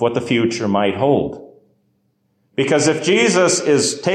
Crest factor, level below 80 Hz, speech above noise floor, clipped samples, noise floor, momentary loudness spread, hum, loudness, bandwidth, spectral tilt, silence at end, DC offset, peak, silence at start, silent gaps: 14 dB; -52 dBFS; 48 dB; under 0.1%; -64 dBFS; 9 LU; none; -16 LUFS; 12.5 kHz; -4 dB/octave; 0 s; under 0.1%; -4 dBFS; 0 s; none